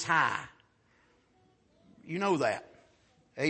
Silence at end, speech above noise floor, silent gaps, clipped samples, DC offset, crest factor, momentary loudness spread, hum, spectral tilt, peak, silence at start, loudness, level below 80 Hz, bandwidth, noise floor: 0 s; 38 dB; none; under 0.1%; under 0.1%; 22 dB; 20 LU; none; -4.5 dB/octave; -12 dBFS; 0 s; -31 LUFS; -74 dBFS; 8.4 kHz; -68 dBFS